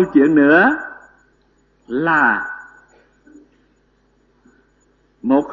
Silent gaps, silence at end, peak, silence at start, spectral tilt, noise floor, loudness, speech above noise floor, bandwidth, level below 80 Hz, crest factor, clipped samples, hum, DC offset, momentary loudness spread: none; 0 s; -2 dBFS; 0 s; -7.5 dB/octave; -59 dBFS; -15 LUFS; 45 dB; 7.4 kHz; -56 dBFS; 18 dB; under 0.1%; none; under 0.1%; 18 LU